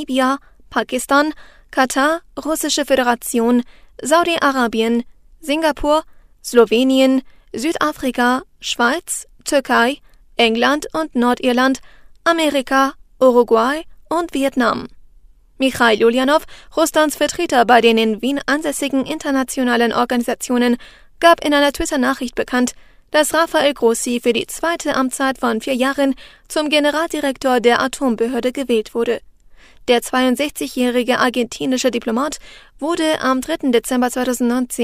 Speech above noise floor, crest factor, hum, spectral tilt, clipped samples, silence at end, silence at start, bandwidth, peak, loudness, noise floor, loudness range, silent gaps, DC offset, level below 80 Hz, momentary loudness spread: 30 dB; 18 dB; none; -2.5 dB/octave; under 0.1%; 0 s; 0 s; 16 kHz; 0 dBFS; -17 LUFS; -47 dBFS; 3 LU; none; under 0.1%; -46 dBFS; 9 LU